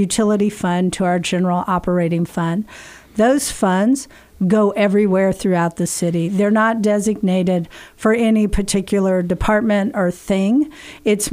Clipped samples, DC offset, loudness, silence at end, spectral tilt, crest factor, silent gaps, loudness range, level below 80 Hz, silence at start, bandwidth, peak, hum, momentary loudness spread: under 0.1%; under 0.1%; -17 LUFS; 0 s; -5.5 dB/octave; 12 dB; none; 2 LU; -38 dBFS; 0 s; 16 kHz; -4 dBFS; none; 7 LU